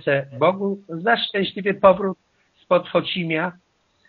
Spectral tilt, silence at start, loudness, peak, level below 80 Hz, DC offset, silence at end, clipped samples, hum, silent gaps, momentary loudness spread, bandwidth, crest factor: -3.5 dB/octave; 0.05 s; -21 LUFS; -2 dBFS; -58 dBFS; under 0.1%; 0.55 s; under 0.1%; none; none; 10 LU; 4.9 kHz; 20 dB